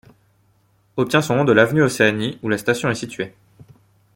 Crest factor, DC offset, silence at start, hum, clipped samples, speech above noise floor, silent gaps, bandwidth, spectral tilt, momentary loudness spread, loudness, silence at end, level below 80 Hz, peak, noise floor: 18 dB; under 0.1%; 0.95 s; none; under 0.1%; 42 dB; none; 17 kHz; -5.5 dB/octave; 15 LU; -18 LUFS; 0.85 s; -56 dBFS; -2 dBFS; -60 dBFS